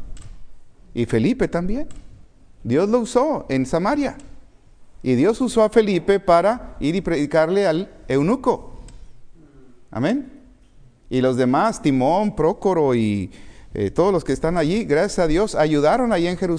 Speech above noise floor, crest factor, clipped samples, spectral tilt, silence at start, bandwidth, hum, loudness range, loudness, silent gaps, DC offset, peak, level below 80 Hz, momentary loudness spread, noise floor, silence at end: 30 dB; 18 dB; under 0.1%; -6.5 dB/octave; 0 s; 10.5 kHz; none; 5 LU; -20 LUFS; none; under 0.1%; -2 dBFS; -40 dBFS; 10 LU; -48 dBFS; 0 s